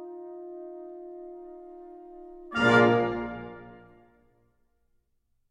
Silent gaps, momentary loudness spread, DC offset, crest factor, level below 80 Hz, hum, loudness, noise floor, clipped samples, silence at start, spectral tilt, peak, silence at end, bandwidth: none; 26 LU; under 0.1%; 22 dB; -60 dBFS; none; -24 LUFS; -73 dBFS; under 0.1%; 0 s; -6.5 dB/octave; -8 dBFS; 1.8 s; 10.5 kHz